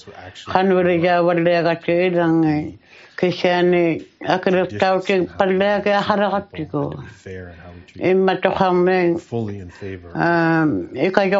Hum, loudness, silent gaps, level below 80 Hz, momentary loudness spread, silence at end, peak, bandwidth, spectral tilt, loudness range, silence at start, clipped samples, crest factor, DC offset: none; -18 LUFS; none; -58 dBFS; 17 LU; 0 s; 0 dBFS; 7.6 kHz; -5 dB/octave; 3 LU; 0.05 s; under 0.1%; 18 dB; under 0.1%